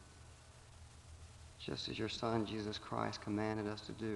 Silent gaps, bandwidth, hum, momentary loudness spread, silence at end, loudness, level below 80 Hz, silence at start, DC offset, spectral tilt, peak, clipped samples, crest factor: none; 11.5 kHz; none; 20 LU; 0 s; -41 LUFS; -64 dBFS; 0 s; under 0.1%; -5.5 dB/octave; -22 dBFS; under 0.1%; 22 dB